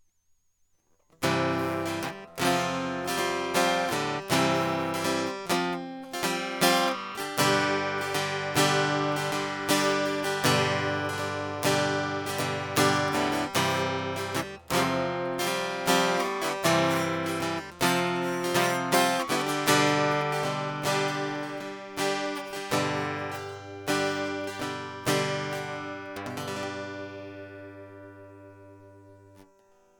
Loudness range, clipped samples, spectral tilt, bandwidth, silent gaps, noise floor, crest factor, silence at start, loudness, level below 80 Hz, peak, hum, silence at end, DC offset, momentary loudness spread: 7 LU; under 0.1%; -3.5 dB/octave; 19 kHz; none; -69 dBFS; 20 dB; 1.2 s; -27 LUFS; -64 dBFS; -8 dBFS; none; 0.55 s; under 0.1%; 12 LU